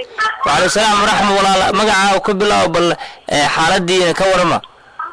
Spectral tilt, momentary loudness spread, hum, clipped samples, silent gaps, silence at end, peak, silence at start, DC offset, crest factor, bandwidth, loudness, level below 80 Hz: -3 dB/octave; 6 LU; none; under 0.1%; none; 0 s; -6 dBFS; 0 s; under 0.1%; 8 dB; 11 kHz; -13 LUFS; -40 dBFS